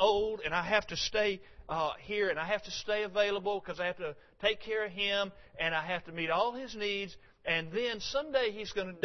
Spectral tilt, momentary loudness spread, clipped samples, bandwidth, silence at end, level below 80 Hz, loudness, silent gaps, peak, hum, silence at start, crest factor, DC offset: -1 dB/octave; 7 LU; under 0.1%; 6.2 kHz; 0 s; -58 dBFS; -33 LUFS; none; -12 dBFS; none; 0 s; 22 dB; under 0.1%